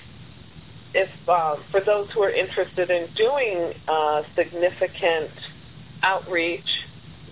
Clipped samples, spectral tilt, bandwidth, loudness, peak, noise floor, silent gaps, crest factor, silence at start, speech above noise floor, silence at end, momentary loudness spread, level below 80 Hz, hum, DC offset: under 0.1%; -8 dB/octave; 4 kHz; -23 LUFS; -6 dBFS; -44 dBFS; none; 18 dB; 0 s; 22 dB; 0 s; 6 LU; -56 dBFS; none; 0.3%